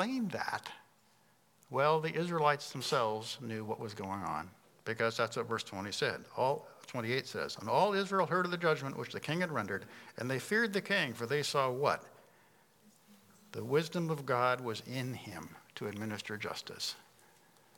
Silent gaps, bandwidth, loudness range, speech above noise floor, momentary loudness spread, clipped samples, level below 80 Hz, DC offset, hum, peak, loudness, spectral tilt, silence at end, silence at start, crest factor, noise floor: none; 18 kHz; 3 LU; 34 dB; 11 LU; under 0.1%; -80 dBFS; under 0.1%; none; -14 dBFS; -35 LUFS; -4.5 dB/octave; 0.75 s; 0 s; 22 dB; -69 dBFS